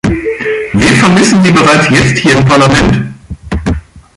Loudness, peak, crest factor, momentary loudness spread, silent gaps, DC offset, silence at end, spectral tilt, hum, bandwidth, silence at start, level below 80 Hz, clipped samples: -8 LUFS; 0 dBFS; 8 dB; 12 LU; none; under 0.1%; 0.15 s; -5 dB/octave; none; 11.5 kHz; 0.05 s; -26 dBFS; under 0.1%